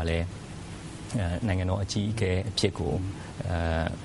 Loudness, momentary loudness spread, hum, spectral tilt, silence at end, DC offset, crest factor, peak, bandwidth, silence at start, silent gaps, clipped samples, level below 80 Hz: -29 LUFS; 13 LU; none; -5.5 dB/octave; 0 s; under 0.1%; 22 dB; -8 dBFS; 11.5 kHz; 0 s; none; under 0.1%; -42 dBFS